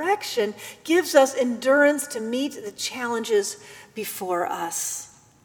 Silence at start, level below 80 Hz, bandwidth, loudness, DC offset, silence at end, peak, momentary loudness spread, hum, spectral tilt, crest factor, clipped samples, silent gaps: 0 s; -72 dBFS; over 20 kHz; -24 LUFS; under 0.1%; 0.35 s; -4 dBFS; 15 LU; none; -2 dB/octave; 20 dB; under 0.1%; none